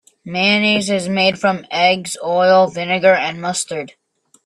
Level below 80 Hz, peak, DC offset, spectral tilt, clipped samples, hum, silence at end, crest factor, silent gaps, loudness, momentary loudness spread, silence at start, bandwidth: -60 dBFS; 0 dBFS; under 0.1%; -3.5 dB/octave; under 0.1%; none; 0.6 s; 16 dB; none; -16 LUFS; 10 LU; 0.25 s; 13.5 kHz